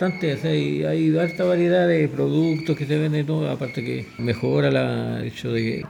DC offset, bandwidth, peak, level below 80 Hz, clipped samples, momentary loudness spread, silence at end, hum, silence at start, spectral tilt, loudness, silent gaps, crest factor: under 0.1%; 11.5 kHz; -6 dBFS; -58 dBFS; under 0.1%; 9 LU; 0 s; none; 0 s; -7.5 dB/octave; -22 LUFS; none; 16 dB